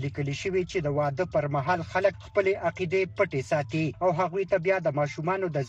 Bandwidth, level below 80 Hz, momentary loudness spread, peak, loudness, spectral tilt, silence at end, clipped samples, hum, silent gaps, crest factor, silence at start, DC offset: 8.6 kHz; -56 dBFS; 3 LU; -10 dBFS; -27 LUFS; -6.5 dB/octave; 0 s; under 0.1%; none; none; 18 dB; 0 s; under 0.1%